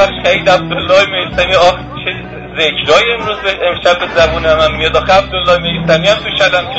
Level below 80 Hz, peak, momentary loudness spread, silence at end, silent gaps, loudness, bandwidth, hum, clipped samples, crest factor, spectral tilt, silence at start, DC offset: -30 dBFS; 0 dBFS; 6 LU; 0 s; none; -11 LUFS; 8 kHz; none; 0.1%; 12 dB; -4 dB/octave; 0 s; under 0.1%